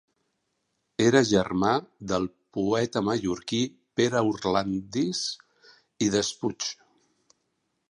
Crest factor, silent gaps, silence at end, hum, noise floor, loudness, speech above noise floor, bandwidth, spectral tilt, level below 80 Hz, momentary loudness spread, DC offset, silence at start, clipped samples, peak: 22 dB; none; 1.2 s; none; -77 dBFS; -26 LUFS; 51 dB; 11.5 kHz; -4.5 dB/octave; -58 dBFS; 11 LU; under 0.1%; 1 s; under 0.1%; -6 dBFS